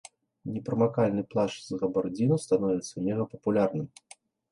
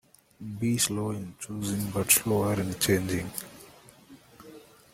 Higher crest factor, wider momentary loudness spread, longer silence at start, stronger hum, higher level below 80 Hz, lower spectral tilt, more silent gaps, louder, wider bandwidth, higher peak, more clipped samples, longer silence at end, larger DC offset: second, 16 dB vs 26 dB; second, 11 LU vs 17 LU; about the same, 0.45 s vs 0.4 s; neither; second, -64 dBFS vs -58 dBFS; first, -7 dB/octave vs -4 dB/octave; neither; about the same, -29 LUFS vs -27 LUFS; second, 11.5 kHz vs 16.5 kHz; second, -12 dBFS vs -4 dBFS; neither; first, 0.65 s vs 0.3 s; neither